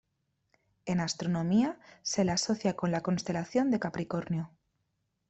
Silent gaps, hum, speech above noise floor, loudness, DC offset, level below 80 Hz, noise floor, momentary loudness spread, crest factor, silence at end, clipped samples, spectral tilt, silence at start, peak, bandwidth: none; none; 49 dB; -31 LUFS; under 0.1%; -64 dBFS; -79 dBFS; 8 LU; 16 dB; 0.8 s; under 0.1%; -5 dB/octave; 0.85 s; -16 dBFS; 8.2 kHz